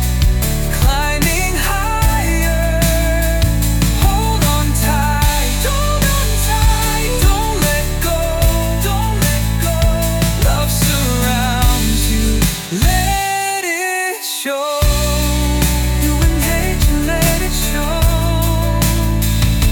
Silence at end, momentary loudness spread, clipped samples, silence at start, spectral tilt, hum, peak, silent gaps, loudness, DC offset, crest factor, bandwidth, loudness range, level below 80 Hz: 0 s; 3 LU; under 0.1%; 0 s; -4 dB/octave; none; -2 dBFS; none; -15 LUFS; under 0.1%; 12 dB; 19 kHz; 1 LU; -18 dBFS